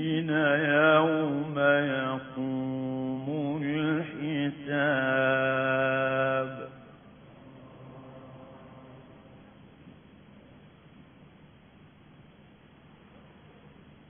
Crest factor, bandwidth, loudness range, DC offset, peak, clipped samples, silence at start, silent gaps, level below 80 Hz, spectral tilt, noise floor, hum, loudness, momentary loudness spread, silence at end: 20 dB; 3.6 kHz; 24 LU; under 0.1%; -10 dBFS; under 0.1%; 0 s; none; -68 dBFS; -2.5 dB/octave; -55 dBFS; none; -27 LUFS; 25 LU; 0.2 s